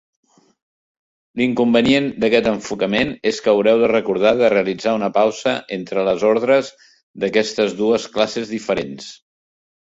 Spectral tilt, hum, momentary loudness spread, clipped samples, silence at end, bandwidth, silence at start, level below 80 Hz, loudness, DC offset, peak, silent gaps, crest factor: -5 dB/octave; none; 9 LU; under 0.1%; 0.75 s; 8 kHz; 1.35 s; -54 dBFS; -18 LUFS; under 0.1%; -2 dBFS; 7.03-7.14 s; 16 dB